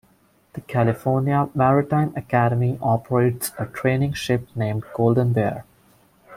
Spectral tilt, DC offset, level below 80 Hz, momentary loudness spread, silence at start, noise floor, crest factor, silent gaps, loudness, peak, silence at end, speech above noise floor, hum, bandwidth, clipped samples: -7 dB/octave; under 0.1%; -52 dBFS; 8 LU; 0.55 s; -59 dBFS; 16 dB; none; -21 LUFS; -6 dBFS; 0 s; 38 dB; none; 16 kHz; under 0.1%